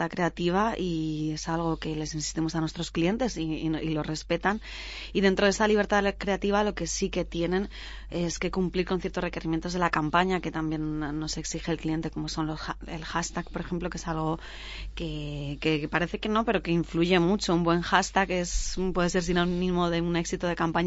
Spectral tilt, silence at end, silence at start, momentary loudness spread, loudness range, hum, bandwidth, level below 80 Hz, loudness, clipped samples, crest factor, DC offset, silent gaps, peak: -5 dB/octave; 0 s; 0 s; 10 LU; 6 LU; none; 8 kHz; -42 dBFS; -28 LUFS; under 0.1%; 22 dB; under 0.1%; none; -6 dBFS